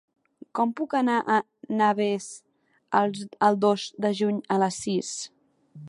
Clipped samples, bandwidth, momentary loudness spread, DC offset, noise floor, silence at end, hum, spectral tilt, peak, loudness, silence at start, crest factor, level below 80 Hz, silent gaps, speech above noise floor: under 0.1%; 11.5 kHz; 11 LU; under 0.1%; -48 dBFS; 0 s; none; -5 dB/octave; -6 dBFS; -25 LUFS; 0.55 s; 20 dB; -74 dBFS; none; 24 dB